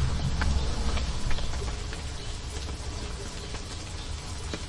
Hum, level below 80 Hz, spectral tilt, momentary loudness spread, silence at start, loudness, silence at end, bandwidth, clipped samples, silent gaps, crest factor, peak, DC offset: none; -32 dBFS; -4.5 dB/octave; 8 LU; 0 s; -33 LUFS; 0 s; 11.5 kHz; under 0.1%; none; 16 dB; -14 dBFS; under 0.1%